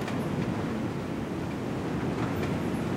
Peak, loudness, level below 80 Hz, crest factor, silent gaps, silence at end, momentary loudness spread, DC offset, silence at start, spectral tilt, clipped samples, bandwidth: -18 dBFS; -31 LUFS; -50 dBFS; 14 dB; none; 0 s; 3 LU; under 0.1%; 0 s; -7 dB/octave; under 0.1%; 16 kHz